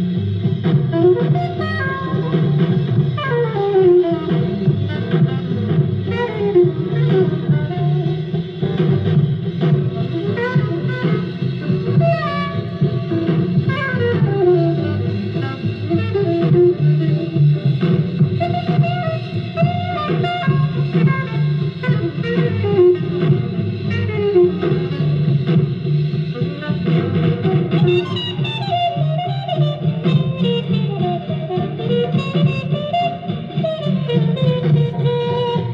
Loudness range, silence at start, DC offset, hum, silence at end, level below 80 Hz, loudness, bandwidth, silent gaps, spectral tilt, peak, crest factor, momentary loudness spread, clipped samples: 2 LU; 0 s; under 0.1%; none; 0 s; -52 dBFS; -18 LUFS; 5.6 kHz; none; -9.5 dB/octave; -2 dBFS; 14 dB; 7 LU; under 0.1%